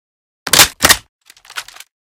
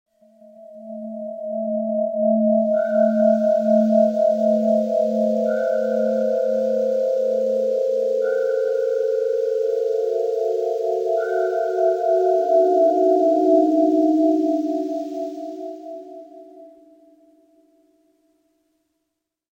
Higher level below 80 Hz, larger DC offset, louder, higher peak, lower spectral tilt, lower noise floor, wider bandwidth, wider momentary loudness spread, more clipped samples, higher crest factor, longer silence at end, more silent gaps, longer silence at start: first, -40 dBFS vs -82 dBFS; neither; first, -10 LUFS vs -20 LUFS; first, 0 dBFS vs -6 dBFS; second, 0 dB/octave vs -8 dB/octave; second, -32 dBFS vs -79 dBFS; first, over 20 kHz vs 16 kHz; first, 21 LU vs 14 LU; first, 0.7% vs under 0.1%; about the same, 16 dB vs 14 dB; second, 0.5 s vs 2.85 s; first, 1.09-1.19 s vs none; second, 0.45 s vs 0.6 s